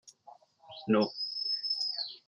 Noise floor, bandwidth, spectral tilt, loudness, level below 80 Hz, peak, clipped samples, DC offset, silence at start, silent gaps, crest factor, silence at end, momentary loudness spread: -58 dBFS; 10.5 kHz; -5 dB/octave; -31 LUFS; -84 dBFS; -14 dBFS; under 0.1%; under 0.1%; 0.05 s; none; 20 dB; 0.1 s; 11 LU